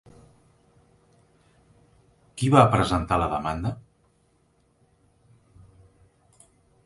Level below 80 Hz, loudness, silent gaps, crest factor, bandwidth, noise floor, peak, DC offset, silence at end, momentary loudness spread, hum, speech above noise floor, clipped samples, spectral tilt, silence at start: -46 dBFS; -22 LUFS; none; 26 dB; 11.5 kHz; -65 dBFS; -2 dBFS; under 0.1%; 3.05 s; 18 LU; none; 44 dB; under 0.1%; -6.5 dB/octave; 2.35 s